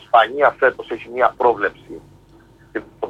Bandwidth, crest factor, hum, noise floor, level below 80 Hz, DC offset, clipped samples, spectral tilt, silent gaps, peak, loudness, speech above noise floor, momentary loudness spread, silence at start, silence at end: 8 kHz; 16 dB; none; -48 dBFS; -54 dBFS; under 0.1%; under 0.1%; -5.5 dB/octave; none; -2 dBFS; -18 LUFS; 31 dB; 21 LU; 0.15 s; 0 s